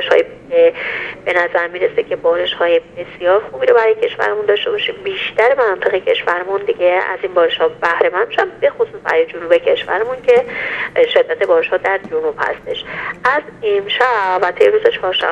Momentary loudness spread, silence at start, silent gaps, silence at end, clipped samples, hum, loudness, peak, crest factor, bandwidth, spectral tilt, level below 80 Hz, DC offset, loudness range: 7 LU; 0 s; none; 0 s; under 0.1%; none; -15 LUFS; 0 dBFS; 16 dB; 7.8 kHz; -4.5 dB/octave; -54 dBFS; under 0.1%; 1 LU